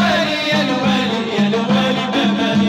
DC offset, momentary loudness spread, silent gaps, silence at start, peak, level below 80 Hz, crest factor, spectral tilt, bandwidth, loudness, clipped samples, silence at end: under 0.1%; 2 LU; none; 0 s; -4 dBFS; -54 dBFS; 12 dB; -5 dB/octave; 12 kHz; -16 LUFS; under 0.1%; 0 s